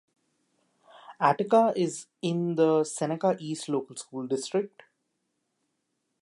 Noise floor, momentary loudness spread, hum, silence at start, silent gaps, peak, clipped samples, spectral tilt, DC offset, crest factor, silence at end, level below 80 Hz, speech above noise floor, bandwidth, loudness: -79 dBFS; 10 LU; none; 0.95 s; none; -6 dBFS; under 0.1%; -5.5 dB/octave; under 0.1%; 24 dB; 1.55 s; -84 dBFS; 52 dB; 11.5 kHz; -27 LUFS